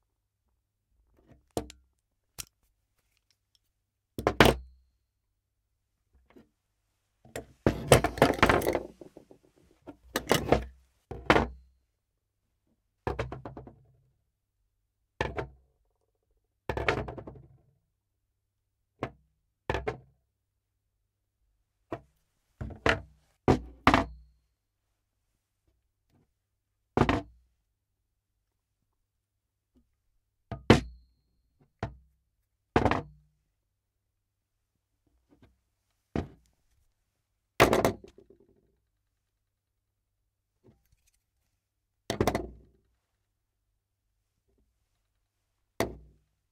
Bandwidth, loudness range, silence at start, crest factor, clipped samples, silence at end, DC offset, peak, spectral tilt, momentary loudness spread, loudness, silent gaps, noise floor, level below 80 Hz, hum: 16 kHz; 16 LU; 1.55 s; 30 dB; under 0.1%; 0.55 s; under 0.1%; -4 dBFS; -5 dB/octave; 22 LU; -28 LUFS; none; -83 dBFS; -48 dBFS; none